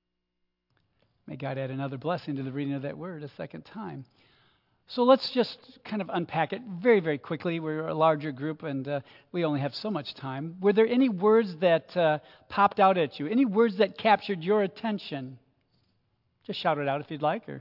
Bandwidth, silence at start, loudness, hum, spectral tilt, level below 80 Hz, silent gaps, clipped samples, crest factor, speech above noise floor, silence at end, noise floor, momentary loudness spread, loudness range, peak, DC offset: 5.8 kHz; 1.25 s; -27 LUFS; none; -8.5 dB/octave; -76 dBFS; none; under 0.1%; 20 dB; 53 dB; 0 s; -80 dBFS; 15 LU; 10 LU; -8 dBFS; under 0.1%